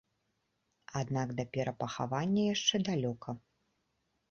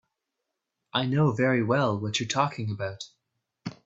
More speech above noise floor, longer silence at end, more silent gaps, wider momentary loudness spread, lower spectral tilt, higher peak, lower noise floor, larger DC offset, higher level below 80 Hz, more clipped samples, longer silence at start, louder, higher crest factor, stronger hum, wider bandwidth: second, 47 dB vs 58 dB; first, 0.95 s vs 0.15 s; neither; second, 13 LU vs 18 LU; about the same, -5 dB/octave vs -5.5 dB/octave; second, -14 dBFS vs -8 dBFS; second, -80 dBFS vs -84 dBFS; neither; about the same, -68 dBFS vs -66 dBFS; neither; about the same, 0.9 s vs 0.95 s; second, -34 LUFS vs -26 LUFS; about the same, 22 dB vs 20 dB; neither; about the same, 7.4 kHz vs 8 kHz